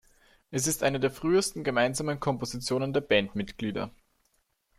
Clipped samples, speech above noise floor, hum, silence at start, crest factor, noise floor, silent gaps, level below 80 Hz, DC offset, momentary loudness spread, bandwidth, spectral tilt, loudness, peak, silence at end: under 0.1%; 45 dB; none; 0.5 s; 20 dB; -73 dBFS; none; -56 dBFS; under 0.1%; 8 LU; 15.5 kHz; -4 dB/octave; -28 LUFS; -10 dBFS; 0.9 s